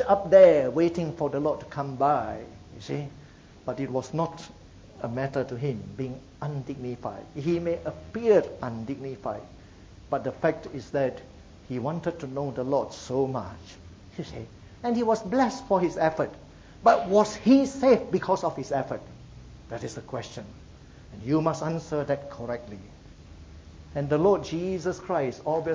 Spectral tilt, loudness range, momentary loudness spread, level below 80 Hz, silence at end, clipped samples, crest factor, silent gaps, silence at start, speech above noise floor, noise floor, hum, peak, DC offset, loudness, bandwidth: -7 dB/octave; 9 LU; 18 LU; -52 dBFS; 0 s; under 0.1%; 20 dB; none; 0 s; 23 dB; -49 dBFS; none; -6 dBFS; under 0.1%; -27 LUFS; 8 kHz